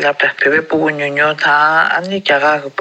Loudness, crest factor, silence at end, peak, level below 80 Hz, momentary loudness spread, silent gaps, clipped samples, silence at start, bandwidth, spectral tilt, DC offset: -13 LUFS; 12 dB; 0 s; -2 dBFS; -64 dBFS; 5 LU; none; under 0.1%; 0 s; 8.8 kHz; -4.5 dB/octave; under 0.1%